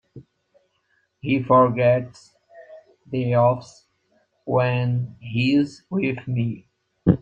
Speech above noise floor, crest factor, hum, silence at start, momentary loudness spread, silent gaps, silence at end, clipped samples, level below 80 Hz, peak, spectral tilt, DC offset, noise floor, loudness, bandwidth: 47 dB; 20 dB; none; 0.15 s; 13 LU; none; 0.05 s; under 0.1%; -54 dBFS; -2 dBFS; -8.5 dB/octave; under 0.1%; -68 dBFS; -22 LUFS; 8 kHz